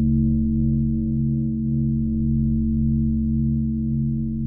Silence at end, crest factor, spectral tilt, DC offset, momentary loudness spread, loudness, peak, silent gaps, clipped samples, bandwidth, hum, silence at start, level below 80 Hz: 0 s; 10 dB; -21 dB/octave; under 0.1%; 3 LU; -22 LUFS; -10 dBFS; none; under 0.1%; 0.7 kHz; none; 0 s; -28 dBFS